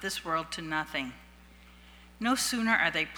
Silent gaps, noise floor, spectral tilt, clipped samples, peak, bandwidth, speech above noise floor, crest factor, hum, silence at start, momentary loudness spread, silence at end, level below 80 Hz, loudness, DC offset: none; -54 dBFS; -2.5 dB/octave; under 0.1%; -12 dBFS; over 20 kHz; 24 dB; 22 dB; 60 Hz at -55 dBFS; 0 s; 9 LU; 0 s; -58 dBFS; -29 LUFS; under 0.1%